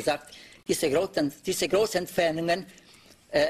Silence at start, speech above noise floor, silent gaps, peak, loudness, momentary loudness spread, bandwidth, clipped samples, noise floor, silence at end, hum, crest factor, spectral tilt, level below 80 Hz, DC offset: 0 s; 28 dB; none; -12 dBFS; -27 LUFS; 11 LU; 15 kHz; under 0.1%; -55 dBFS; 0 s; none; 16 dB; -3.5 dB/octave; -58 dBFS; under 0.1%